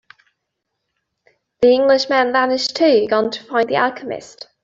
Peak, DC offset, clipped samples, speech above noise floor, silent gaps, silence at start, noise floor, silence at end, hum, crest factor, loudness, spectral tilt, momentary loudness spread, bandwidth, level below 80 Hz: -2 dBFS; under 0.1%; under 0.1%; 60 dB; none; 1.6 s; -76 dBFS; 0.35 s; none; 16 dB; -16 LUFS; -3.5 dB/octave; 15 LU; 7.8 kHz; -60 dBFS